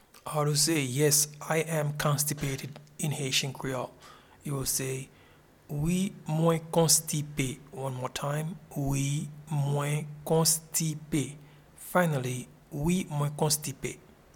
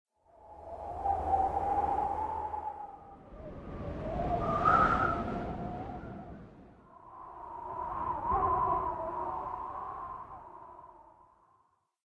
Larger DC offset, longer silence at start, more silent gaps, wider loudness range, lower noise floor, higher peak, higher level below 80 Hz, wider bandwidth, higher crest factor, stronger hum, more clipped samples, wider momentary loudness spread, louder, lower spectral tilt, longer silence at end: neither; second, 0.25 s vs 0.4 s; neither; about the same, 4 LU vs 6 LU; second, -58 dBFS vs -72 dBFS; first, -10 dBFS vs -14 dBFS; about the same, -54 dBFS vs -50 dBFS; first, 19 kHz vs 11 kHz; about the same, 20 dB vs 22 dB; neither; neither; second, 14 LU vs 21 LU; first, -29 LUFS vs -33 LUFS; second, -4 dB/octave vs -8 dB/octave; second, 0.35 s vs 1 s